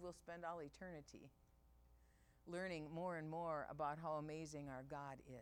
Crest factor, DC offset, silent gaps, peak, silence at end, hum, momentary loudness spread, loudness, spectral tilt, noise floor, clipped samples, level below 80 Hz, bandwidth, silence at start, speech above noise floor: 18 dB; under 0.1%; none; -34 dBFS; 0 s; none; 11 LU; -50 LUFS; -6 dB/octave; -73 dBFS; under 0.1%; -72 dBFS; 17 kHz; 0 s; 23 dB